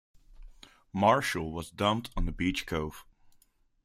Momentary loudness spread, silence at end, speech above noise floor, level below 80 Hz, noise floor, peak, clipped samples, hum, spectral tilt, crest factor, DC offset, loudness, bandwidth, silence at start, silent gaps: 14 LU; 0.8 s; 36 dB; -42 dBFS; -66 dBFS; -10 dBFS; under 0.1%; none; -5 dB/octave; 22 dB; under 0.1%; -30 LUFS; 16 kHz; 0.4 s; none